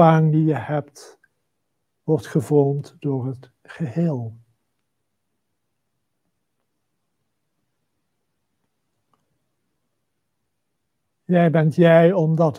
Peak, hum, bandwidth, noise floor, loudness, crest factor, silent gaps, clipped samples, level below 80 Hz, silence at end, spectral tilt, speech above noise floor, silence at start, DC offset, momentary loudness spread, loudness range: -2 dBFS; none; 11 kHz; -78 dBFS; -19 LUFS; 22 dB; none; under 0.1%; -72 dBFS; 0 s; -8.5 dB/octave; 59 dB; 0 s; under 0.1%; 16 LU; 11 LU